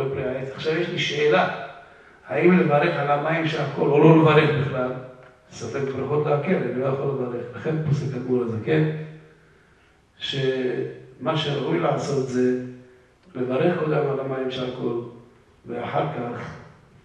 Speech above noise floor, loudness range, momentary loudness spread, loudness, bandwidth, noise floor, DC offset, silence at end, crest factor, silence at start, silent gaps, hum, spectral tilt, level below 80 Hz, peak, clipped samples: 35 dB; 7 LU; 16 LU; -23 LUFS; 8.8 kHz; -57 dBFS; under 0.1%; 0.35 s; 20 dB; 0 s; none; none; -7 dB/octave; -62 dBFS; -2 dBFS; under 0.1%